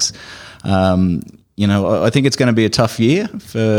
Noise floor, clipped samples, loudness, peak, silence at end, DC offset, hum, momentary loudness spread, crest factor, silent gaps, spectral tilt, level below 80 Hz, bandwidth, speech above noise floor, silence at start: -36 dBFS; under 0.1%; -16 LUFS; -2 dBFS; 0 s; under 0.1%; none; 13 LU; 14 dB; none; -5.5 dB/octave; -46 dBFS; 16.5 kHz; 22 dB; 0 s